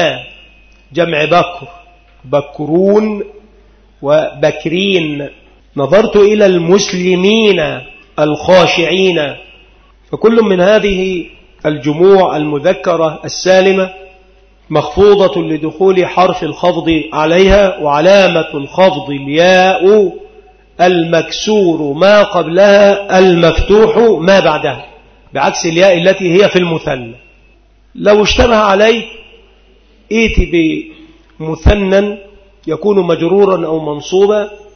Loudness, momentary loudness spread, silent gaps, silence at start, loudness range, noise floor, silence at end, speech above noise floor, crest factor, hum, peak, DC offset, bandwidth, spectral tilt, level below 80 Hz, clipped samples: -10 LUFS; 12 LU; none; 0 s; 5 LU; -46 dBFS; 0.2 s; 36 dB; 10 dB; none; 0 dBFS; under 0.1%; 6.6 kHz; -5.5 dB/octave; -28 dBFS; under 0.1%